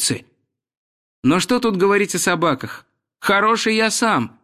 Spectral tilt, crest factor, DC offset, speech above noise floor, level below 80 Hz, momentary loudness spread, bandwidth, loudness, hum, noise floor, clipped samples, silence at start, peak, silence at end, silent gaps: -3.5 dB/octave; 14 dB; under 0.1%; 48 dB; -58 dBFS; 10 LU; 15.5 kHz; -18 LUFS; none; -65 dBFS; under 0.1%; 0 s; -4 dBFS; 0.15 s; 0.77-1.22 s